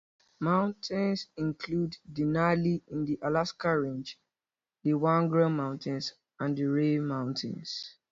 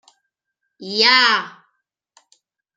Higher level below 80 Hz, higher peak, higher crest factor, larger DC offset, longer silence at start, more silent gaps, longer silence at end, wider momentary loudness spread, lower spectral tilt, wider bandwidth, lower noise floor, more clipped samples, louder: first, -64 dBFS vs -76 dBFS; second, -12 dBFS vs 0 dBFS; about the same, 18 dB vs 22 dB; neither; second, 0.4 s vs 0.8 s; neither; second, 0.2 s vs 1.3 s; second, 10 LU vs 25 LU; first, -7 dB/octave vs -1.5 dB/octave; second, 7.6 kHz vs 12 kHz; first, under -90 dBFS vs -78 dBFS; neither; second, -30 LUFS vs -14 LUFS